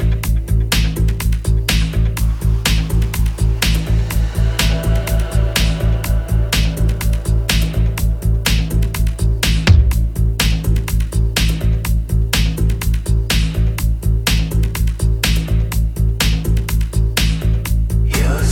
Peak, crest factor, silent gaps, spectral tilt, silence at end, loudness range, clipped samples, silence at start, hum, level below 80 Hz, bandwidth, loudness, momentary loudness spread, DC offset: 0 dBFS; 14 dB; none; -4.5 dB/octave; 0 s; 1 LU; under 0.1%; 0 s; none; -16 dBFS; 17 kHz; -17 LUFS; 3 LU; under 0.1%